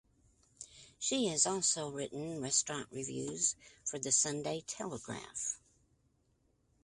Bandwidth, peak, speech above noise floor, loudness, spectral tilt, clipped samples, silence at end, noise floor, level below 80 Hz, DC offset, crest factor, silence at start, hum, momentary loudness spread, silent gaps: 11.5 kHz; -14 dBFS; 38 dB; -35 LUFS; -2 dB/octave; under 0.1%; 1.25 s; -75 dBFS; -72 dBFS; under 0.1%; 24 dB; 0.6 s; none; 14 LU; none